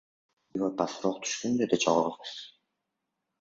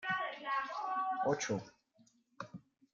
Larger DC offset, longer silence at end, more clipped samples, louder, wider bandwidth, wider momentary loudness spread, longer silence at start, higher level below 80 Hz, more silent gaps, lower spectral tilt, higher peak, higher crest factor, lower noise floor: neither; first, 0.9 s vs 0.35 s; neither; first, -29 LUFS vs -37 LUFS; about the same, 7.8 kHz vs 7.6 kHz; about the same, 15 LU vs 17 LU; first, 0.55 s vs 0 s; first, -70 dBFS vs -78 dBFS; neither; about the same, -4 dB/octave vs -4 dB/octave; first, -8 dBFS vs -20 dBFS; about the same, 22 dB vs 18 dB; first, -84 dBFS vs -71 dBFS